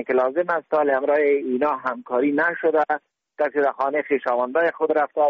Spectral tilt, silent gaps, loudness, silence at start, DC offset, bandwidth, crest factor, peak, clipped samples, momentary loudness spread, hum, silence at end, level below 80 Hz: -3.5 dB/octave; none; -22 LUFS; 0 s; under 0.1%; 5.8 kHz; 12 dB; -8 dBFS; under 0.1%; 5 LU; none; 0 s; -70 dBFS